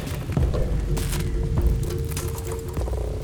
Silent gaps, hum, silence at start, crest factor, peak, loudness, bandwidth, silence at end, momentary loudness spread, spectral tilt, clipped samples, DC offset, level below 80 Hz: none; none; 0 s; 14 dB; -10 dBFS; -26 LUFS; over 20 kHz; 0 s; 5 LU; -6 dB/octave; under 0.1%; under 0.1%; -26 dBFS